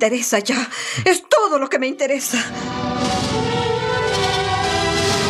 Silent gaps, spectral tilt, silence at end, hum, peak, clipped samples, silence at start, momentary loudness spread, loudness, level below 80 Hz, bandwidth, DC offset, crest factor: none; -3.5 dB/octave; 0 s; none; -2 dBFS; under 0.1%; 0 s; 6 LU; -19 LUFS; -44 dBFS; 15.5 kHz; under 0.1%; 18 dB